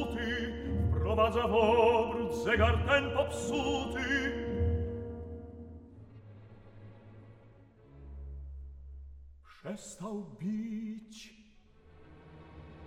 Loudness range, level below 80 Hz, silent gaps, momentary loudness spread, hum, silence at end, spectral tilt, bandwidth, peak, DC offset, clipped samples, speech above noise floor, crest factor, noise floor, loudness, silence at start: 23 LU; -44 dBFS; none; 26 LU; none; 0 s; -6 dB/octave; 12.5 kHz; -14 dBFS; under 0.1%; under 0.1%; 29 dB; 20 dB; -60 dBFS; -31 LUFS; 0 s